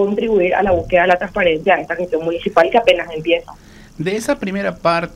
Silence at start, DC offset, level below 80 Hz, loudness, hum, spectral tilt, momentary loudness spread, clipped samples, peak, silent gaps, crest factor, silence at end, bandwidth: 0 s; under 0.1%; -42 dBFS; -16 LUFS; none; -5.5 dB/octave; 7 LU; under 0.1%; 0 dBFS; none; 16 dB; 0 s; 14.5 kHz